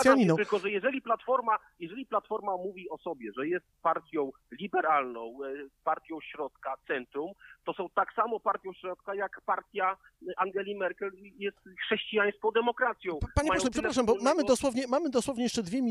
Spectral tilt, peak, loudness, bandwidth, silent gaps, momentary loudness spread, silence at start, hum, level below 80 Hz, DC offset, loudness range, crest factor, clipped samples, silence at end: -4.5 dB/octave; -8 dBFS; -31 LUFS; 14.5 kHz; none; 13 LU; 0 s; none; -52 dBFS; under 0.1%; 6 LU; 22 dB; under 0.1%; 0 s